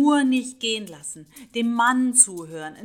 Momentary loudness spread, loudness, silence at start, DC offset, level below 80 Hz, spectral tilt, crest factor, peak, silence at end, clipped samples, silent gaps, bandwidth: 19 LU; -20 LUFS; 0 s; under 0.1%; -68 dBFS; -1.5 dB/octave; 20 dB; -2 dBFS; 0 s; under 0.1%; none; 19 kHz